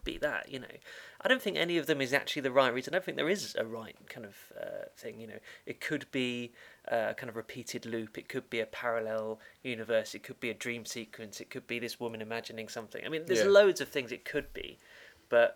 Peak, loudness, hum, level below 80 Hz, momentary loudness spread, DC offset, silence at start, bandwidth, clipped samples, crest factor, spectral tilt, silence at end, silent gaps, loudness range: -10 dBFS; -33 LUFS; none; -62 dBFS; 18 LU; under 0.1%; 0.05 s; 19 kHz; under 0.1%; 24 dB; -4 dB/octave; 0 s; none; 7 LU